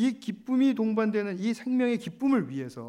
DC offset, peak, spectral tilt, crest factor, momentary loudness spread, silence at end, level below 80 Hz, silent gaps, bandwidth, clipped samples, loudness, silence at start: under 0.1%; -14 dBFS; -6.5 dB/octave; 14 dB; 6 LU; 0 s; -76 dBFS; none; 11 kHz; under 0.1%; -28 LUFS; 0 s